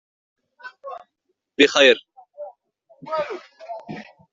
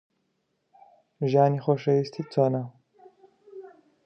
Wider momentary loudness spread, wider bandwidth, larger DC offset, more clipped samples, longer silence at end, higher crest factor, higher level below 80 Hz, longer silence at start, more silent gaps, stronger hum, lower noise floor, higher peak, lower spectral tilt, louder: about the same, 26 LU vs 24 LU; first, 8 kHz vs 6.4 kHz; neither; neither; about the same, 0.3 s vs 0.4 s; about the same, 22 dB vs 20 dB; first, -70 dBFS vs -78 dBFS; second, 0.65 s vs 1.2 s; neither; neither; about the same, -75 dBFS vs -75 dBFS; first, -2 dBFS vs -8 dBFS; second, -2.5 dB/octave vs -9 dB/octave; first, -18 LUFS vs -25 LUFS